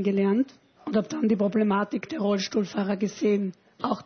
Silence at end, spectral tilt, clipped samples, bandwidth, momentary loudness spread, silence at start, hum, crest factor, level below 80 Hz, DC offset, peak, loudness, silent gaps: 0.05 s; -6.5 dB/octave; under 0.1%; 6.6 kHz; 8 LU; 0 s; none; 14 dB; -68 dBFS; under 0.1%; -12 dBFS; -26 LUFS; none